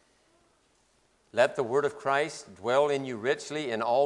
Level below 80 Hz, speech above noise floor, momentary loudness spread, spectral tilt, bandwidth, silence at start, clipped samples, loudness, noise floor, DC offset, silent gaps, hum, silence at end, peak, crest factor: -76 dBFS; 40 dB; 8 LU; -4.5 dB/octave; 11.5 kHz; 1.35 s; under 0.1%; -29 LUFS; -68 dBFS; under 0.1%; none; none; 0 s; -8 dBFS; 20 dB